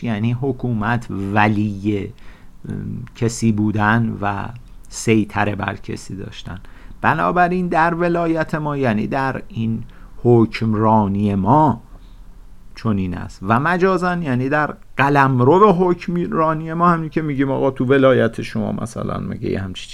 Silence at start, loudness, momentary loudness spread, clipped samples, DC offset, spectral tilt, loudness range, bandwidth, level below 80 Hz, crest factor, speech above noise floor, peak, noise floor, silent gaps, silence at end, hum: 0 s; -18 LUFS; 14 LU; under 0.1%; under 0.1%; -7 dB/octave; 5 LU; 12.5 kHz; -40 dBFS; 18 dB; 20 dB; 0 dBFS; -38 dBFS; none; 0 s; none